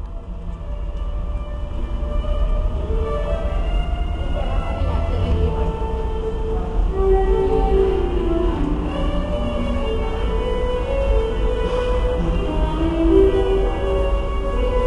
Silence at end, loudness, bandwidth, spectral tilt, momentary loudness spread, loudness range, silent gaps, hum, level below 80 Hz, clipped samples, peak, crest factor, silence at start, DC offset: 0 s; -22 LUFS; 7 kHz; -8 dB/octave; 10 LU; 5 LU; none; none; -22 dBFS; under 0.1%; -2 dBFS; 16 dB; 0 s; under 0.1%